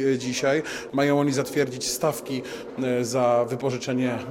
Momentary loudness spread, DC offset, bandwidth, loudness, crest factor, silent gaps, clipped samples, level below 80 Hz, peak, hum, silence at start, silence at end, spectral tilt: 8 LU; under 0.1%; 17 kHz; -25 LUFS; 16 dB; none; under 0.1%; -62 dBFS; -8 dBFS; none; 0 s; 0 s; -4.5 dB/octave